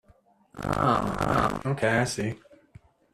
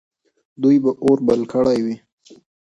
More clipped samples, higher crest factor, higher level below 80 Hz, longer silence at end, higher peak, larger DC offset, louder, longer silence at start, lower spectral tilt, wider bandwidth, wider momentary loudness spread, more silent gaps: neither; about the same, 20 dB vs 16 dB; first, -48 dBFS vs -56 dBFS; about the same, 0.75 s vs 0.75 s; second, -10 dBFS vs -4 dBFS; neither; second, -26 LUFS vs -18 LUFS; about the same, 0.55 s vs 0.6 s; second, -5.5 dB/octave vs -7.5 dB/octave; first, 14.5 kHz vs 9.6 kHz; about the same, 10 LU vs 8 LU; neither